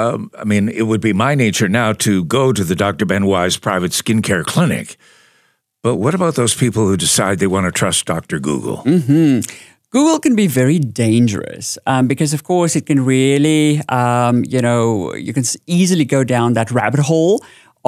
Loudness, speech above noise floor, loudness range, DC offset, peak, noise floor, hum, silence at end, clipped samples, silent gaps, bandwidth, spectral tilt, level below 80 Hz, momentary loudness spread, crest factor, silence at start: -15 LUFS; 44 dB; 2 LU; under 0.1%; 0 dBFS; -59 dBFS; none; 0.5 s; under 0.1%; none; 15.5 kHz; -5 dB/octave; -52 dBFS; 7 LU; 14 dB; 0 s